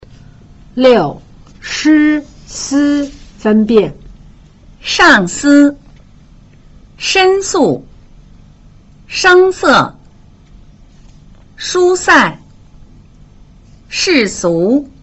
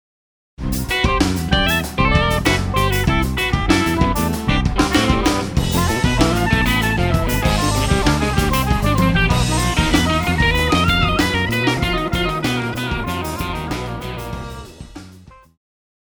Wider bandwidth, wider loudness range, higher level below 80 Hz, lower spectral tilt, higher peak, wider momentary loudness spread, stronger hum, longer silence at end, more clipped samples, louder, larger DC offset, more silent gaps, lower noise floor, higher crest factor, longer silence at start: second, 8.2 kHz vs over 20 kHz; about the same, 4 LU vs 6 LU; second, -40 dBFS vs -26 dBFS; second, -3.5 dB/octave vs -5 dB/octave; about the same, 0 dBFS vs 0 dBFS; first, 14 LU vs 9 LU; neither; second, 0.15 s vs 0.7 s; neither; first, -11 LUFS vs -17 LUFS; neither; neither; about the same, -41 dBFS vs -43 dBFS; about the same, 14 dB vs 18 dB; first, 0.75 s vs 0.6 s